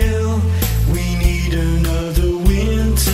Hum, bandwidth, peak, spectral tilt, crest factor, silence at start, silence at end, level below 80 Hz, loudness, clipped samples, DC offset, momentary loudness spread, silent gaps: none; 16.5 kHz; 0 dBFS; -5.5 dB/octave; 14 dB; 0 s; 0 s; -18 dBFS; -17 LUFS; under 0.1%; under 0.1%; 2 LU; none